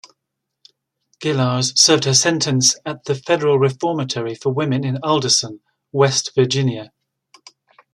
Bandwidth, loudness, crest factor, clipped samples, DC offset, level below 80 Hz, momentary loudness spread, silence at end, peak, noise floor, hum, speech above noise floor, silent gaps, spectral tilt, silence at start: 13 kHz; -17 LUFS; 20 dB; under 0.1%; under 0.1%; -62 dBFS; 12 LU; 1.1 s; 0 dBFS; -79 dBFS; none; 61 dB; none; -3.5 dB/octave; 1.2 s